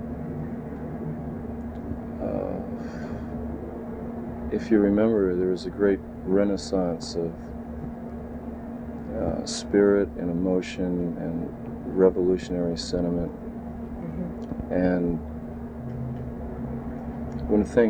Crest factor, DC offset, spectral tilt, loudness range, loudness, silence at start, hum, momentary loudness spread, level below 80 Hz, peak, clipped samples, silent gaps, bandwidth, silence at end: 22 dB; under 0.1%; -7 dB/octave; 8 LU; -28 LUFS; 0 s; none; 14 LU; -42 dBFS; -6 dBFS; under 0.1%; none; 10.5 kHz; 0 s